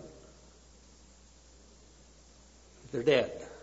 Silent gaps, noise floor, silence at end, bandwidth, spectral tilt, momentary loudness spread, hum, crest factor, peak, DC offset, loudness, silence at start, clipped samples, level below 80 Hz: none; -58 dBFS; 0.05 s; 7.6 kHz; -3.5 dB/octave; 28 LU; none; 24 dB; -12 dBFS; under 0.1%; -30 LUFS; 0 s; under 0.1%; -60 dBFS